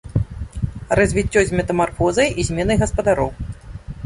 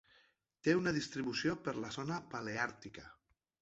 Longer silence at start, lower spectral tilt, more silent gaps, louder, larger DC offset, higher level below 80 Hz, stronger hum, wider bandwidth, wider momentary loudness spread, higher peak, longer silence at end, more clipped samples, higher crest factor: second, 0.05 s vs 0.65 s; first, -5.5 dB/octave vs -4 dB/octave; neither; first, -19 LUFS vs -38 LUFS; neither; first, -32 dBFS vs -70 dBFS; neither; first, 11.5 kHz vs 8 kHz; about the same, 13 LU vs 12 LU; first, 0 dBFS vs -18 dBFS; second, 0 s vs 0.5 s; neither; about the same, 18 dB vs 20 dB